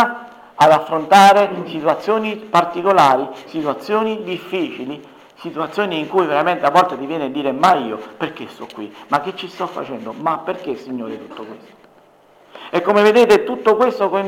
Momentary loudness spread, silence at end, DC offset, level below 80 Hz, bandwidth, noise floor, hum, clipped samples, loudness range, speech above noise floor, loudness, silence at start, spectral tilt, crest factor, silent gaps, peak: 19 LU; 0 s; under 0.1%; -62 dBFS; 17 kHz; -50 dBFS; none; under 0.1%; 10 LU; 33 dB; -16 LUFS; 0 s; -5 dB/octave; 14 dB; none; -2 dBFS